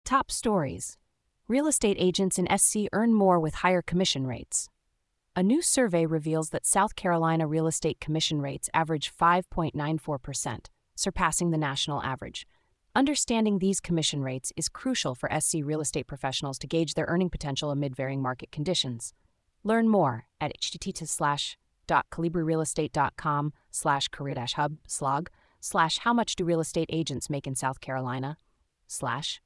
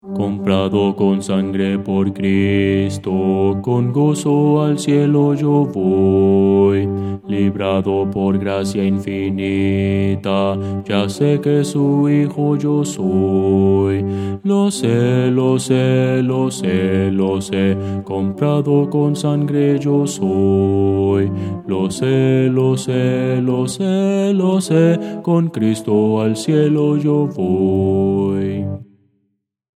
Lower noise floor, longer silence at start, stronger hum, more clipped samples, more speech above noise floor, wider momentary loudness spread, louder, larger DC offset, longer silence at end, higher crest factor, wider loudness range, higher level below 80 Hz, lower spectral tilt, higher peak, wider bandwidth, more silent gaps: first, -77 dBFS vs -69 dBFS; about the same, 0.05 s vs 0.05 s; neither; neither; second, 49 dB vs 54 dB; first, 10 LU vs 5 LU; second, -28 LUFS vs -16 LUFS; neither; second, 0.1 s vs 0.95 s; first, 20 dB vs 14 dB; about the same, 4 LU vs 2 LU; first, -52 dBFS vs -58 dBFS; second, -4 dB/octave vs -7 dB/octave; second, -8 dBFS vs 0 dBFS; about the same, 12 kHz vs 13 kHz; neither